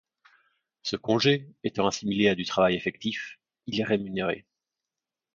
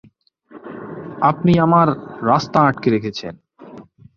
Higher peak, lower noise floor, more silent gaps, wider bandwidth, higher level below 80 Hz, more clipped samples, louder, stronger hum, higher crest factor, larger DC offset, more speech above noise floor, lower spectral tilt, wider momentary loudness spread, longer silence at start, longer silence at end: second, -10 dBFS vs -2 dBFS; first, -89 dBFS vs -51 dBFS; neither; about the same, 7.6 kHz vs 7.2 kHz; second, -62 dBFS vs -52 dBFS; neither; second, -27 LUFS vs -17 LUFS; neither; about the same, 20 dB vs 18 dB; neither; first, 62 dB vs 34 dB; second, -5 dB/octave vs -7.5 dB/octave; second, 12 LU vs 19 LU; first, 0.85 s vs 0.55 s; first, 0.95 s vs 0.35 s